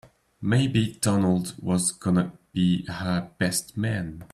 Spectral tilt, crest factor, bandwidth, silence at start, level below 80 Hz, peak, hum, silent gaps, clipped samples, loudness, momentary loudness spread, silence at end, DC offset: -5 dB/octave; 16 dB; 13.5 kHz; 0.4 s; -54 dBFS; -10 dBFS; none; none; under 0.1%; -25 LUFS; 6 LU; 0.1 s; under 0.1%